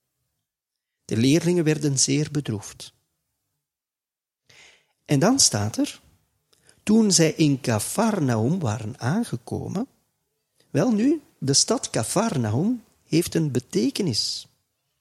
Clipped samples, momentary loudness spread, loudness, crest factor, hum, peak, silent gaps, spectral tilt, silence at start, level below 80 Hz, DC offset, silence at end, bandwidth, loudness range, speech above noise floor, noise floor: under 0.1%; 13 LU; -22 LUFS; 20 dB; none; -4 dBFS; none; -4.5 dB/octave; 1.1 s; -60 dBFS; under 0.1%; 0.6 s; 15.5 kHz; 5 LU; over 68 dB; under -90 dBFS